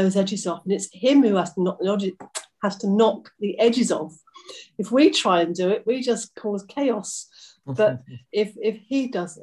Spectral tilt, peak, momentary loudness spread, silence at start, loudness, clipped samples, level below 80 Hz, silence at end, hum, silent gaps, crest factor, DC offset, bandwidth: -5 dB/octave; -6 dBFS; 16 LU; 0 s; -23 LUFS; under 0.1%; -70 dBFS; 0 s; none; none; 18 dB; under 0.1%; 12 kHz